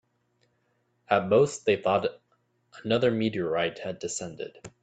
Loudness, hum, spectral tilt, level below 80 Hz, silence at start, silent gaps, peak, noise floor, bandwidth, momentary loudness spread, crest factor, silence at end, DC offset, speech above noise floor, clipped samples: -27 LUFS; none; -5 dB/octave; -66 dBFS; 1.1 s; none; -6 dBFS; -72 dBFS; 9.2 kHz; 15 LU; 22 dB; 0.15 s; under 0.1%; 46 dB; under 0.1%